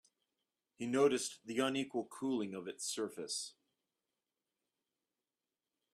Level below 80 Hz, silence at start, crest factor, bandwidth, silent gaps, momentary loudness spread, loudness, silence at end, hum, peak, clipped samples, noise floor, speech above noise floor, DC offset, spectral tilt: -84 dBFS; 0.8 s; 22 dB; 14 kHz; none; 10 LU; -38 LUFS; 2.45 s; none; -20 dBFS; under 0.1%; under -90 dBFS; over 52 dB; under 0.1%; -3.5 dB/octave